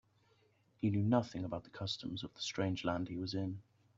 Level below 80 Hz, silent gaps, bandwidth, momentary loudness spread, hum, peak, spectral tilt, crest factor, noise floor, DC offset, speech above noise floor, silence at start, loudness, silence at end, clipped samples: -68 dBFS; none; 7.8 kHz; 10 LU; none; -16 dBFS; -6 dB/octave; 22 dB; -72 dBFS; under 0.1%; 35 dB; 0.8 s; -38 LUFS; 0.35 s; under 0.1%